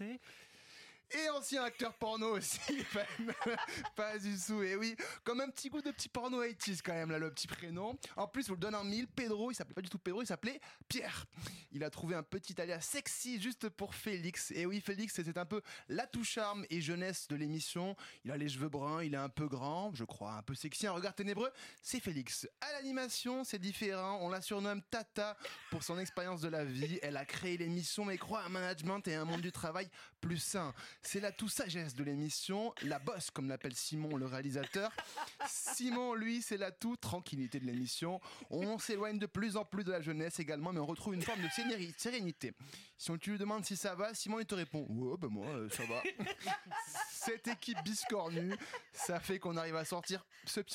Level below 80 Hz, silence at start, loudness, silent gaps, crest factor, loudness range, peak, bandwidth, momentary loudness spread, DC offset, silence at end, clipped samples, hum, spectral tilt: -74 dBFS; 0 s; -41 LUFS; none; 14 dB; 2 LU; -28 dBFS; 16.5 kHz; 6 LU; under 0.1%; 0 s; under 0.1%; none; -4 dB/octave